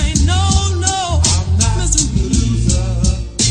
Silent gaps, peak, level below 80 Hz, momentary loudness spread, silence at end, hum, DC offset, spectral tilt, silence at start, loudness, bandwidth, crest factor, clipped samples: none; 0 dBFS; -18 dBFS; 3 LU; 0 s; none; under 0.1%; -4 dB/octave; 0 s; -15 LUFS; 10 kHz; 14 dB; under 0.1%